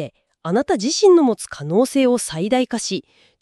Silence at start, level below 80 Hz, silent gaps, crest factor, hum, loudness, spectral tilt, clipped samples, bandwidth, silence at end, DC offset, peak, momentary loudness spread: 0 s; -58 dBFS; none; 14 dB; none; -18 LUFS; -4.5 dB/octave; under 0.1%; 13 kHz; 0.4 s; under 0.1%; -4 dBFS; 13 LU